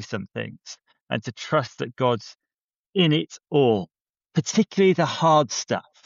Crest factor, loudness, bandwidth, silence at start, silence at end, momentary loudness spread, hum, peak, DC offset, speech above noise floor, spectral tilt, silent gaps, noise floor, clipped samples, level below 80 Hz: 16 dB; -23 LUFS; 7.8 kHz; 0 s; 0.25 s; 14 LU; none; -6 dBFS; under 0.1%; over 67 dB; -4.5 dB/octave; 1.01-1.06 s, 2.54-2.69 s, 2.76-2.93 s, 4.01-4.06 s; under -90 dBFS; under 0.1%; -68 dBFS